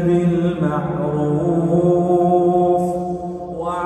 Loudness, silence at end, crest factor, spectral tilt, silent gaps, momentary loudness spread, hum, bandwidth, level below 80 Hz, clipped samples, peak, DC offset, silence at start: -18 LUFS; 0 s; 14 dB; -9 dB/octave; none; 10 LU; none; 9 kHz; -46 dBFS; under 0.1%; -4 dBFS; under 0.1%; 0 s